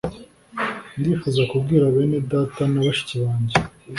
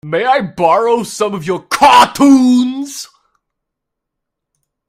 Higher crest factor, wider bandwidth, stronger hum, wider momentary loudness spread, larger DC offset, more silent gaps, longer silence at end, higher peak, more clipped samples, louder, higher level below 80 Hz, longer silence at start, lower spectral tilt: about the same, 18 dB vs 14 dB; second, 11.5 kHz vs 16 kHz; neither; second, 9 LU vs 13 LU; neither; neither; second, 0 s vs 1.85 s; about the same, -2 dBFS vs 0 dBFS; second, under 0.1% vs 0.2%; second, -21 LUFS vs -11 LUFS; about the same, -48 dBFS vs -52 dBFS; about the same, 0.05 s vs 0.05 s; first, -7 dB/octave vs -4 dB/octave